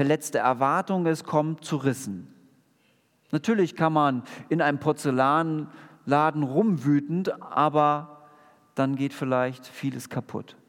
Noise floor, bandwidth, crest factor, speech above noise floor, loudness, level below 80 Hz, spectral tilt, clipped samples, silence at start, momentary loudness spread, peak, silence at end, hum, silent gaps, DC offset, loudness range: -66 dBFS; 17 kHz; 18 dB; 41 dB; -25 LUFS; -78 dBFS; -6.5 dB/octave; under 0.1%; 0 s; 11 LU; -6 dBFS; 0.15 s; none; none; under 0.1%; 3 LU